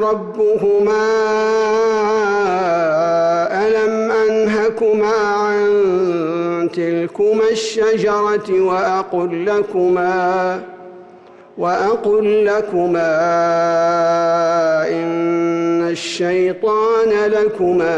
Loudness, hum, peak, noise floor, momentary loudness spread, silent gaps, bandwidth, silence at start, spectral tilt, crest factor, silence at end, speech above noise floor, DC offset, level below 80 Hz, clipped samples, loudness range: -16 LUFS; none; -8 dBFS; -41 dBFS; 4 LU; none; 8.8 kHz; 0 s; -5.5 dB/octave; 8 dB; 0 s; 26 dB; under 0.1%; -56 dBFS; under 0.1%; 2 LU